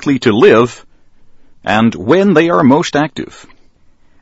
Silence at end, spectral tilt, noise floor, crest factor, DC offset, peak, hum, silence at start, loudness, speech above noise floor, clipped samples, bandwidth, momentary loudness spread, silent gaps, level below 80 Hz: 0.95 s; -6 dB/octave; -46 dBFS; 12 dB; under 0.1%; 0 dBFS; none; 0 s; -11 LUFS; 35 dB; 0.3%; 8 kHz; 13 LU; none; -48 dBFS